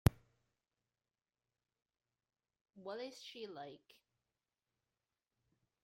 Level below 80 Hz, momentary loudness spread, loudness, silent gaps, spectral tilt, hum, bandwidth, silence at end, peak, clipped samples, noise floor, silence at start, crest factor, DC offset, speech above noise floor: -58 dBFS; 11 LU; -46 LUFS; 2.61-2.65 s; -6.5 dB/octave; none; 16 kHz; 2.05 s; -12 dBFS; under 0.1%; under -90 dBFS; 0.05 s; 36 dB; under 0.1%; over 40 dB